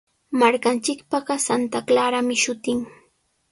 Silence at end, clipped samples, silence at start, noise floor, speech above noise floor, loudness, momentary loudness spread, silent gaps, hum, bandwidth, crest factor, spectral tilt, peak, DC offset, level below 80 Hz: 0.6 s; under 0.1%; 0.3 s; -64 dBFS; 43 dB; -21 LUFS; 8 LU; none; none; 11.5 kHz; 18 dB; -2.5 dB/octave; -4 dBFS; under 0.1%; -64 dBFS